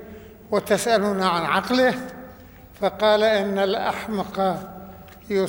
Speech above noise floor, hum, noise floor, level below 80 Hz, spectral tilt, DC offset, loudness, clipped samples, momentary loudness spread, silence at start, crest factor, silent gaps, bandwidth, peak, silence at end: 24 dB; none; -45 dBFS; -54 dBFS; -4.5 dB/octave; under 0.1%; -22 LUFS; under 0.1%; 19 LU; 0 s; 16 dB; none; over 20 kHz; -6 dBFS; 0 s